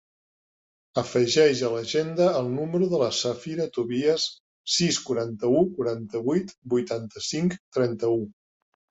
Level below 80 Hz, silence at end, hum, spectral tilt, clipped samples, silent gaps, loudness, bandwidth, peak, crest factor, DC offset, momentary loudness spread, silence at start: -64 dBFS; 0.6 s; none; -4.5 dB/octave; under 0.1%; 4.40-4.65 s, 6.58-6.62 s, 7.60-7.72 s; -25 LUFS; 8.4 kHz; -8 dBFS; 18 dB; under 0.1%; 8 LU; 0.95 s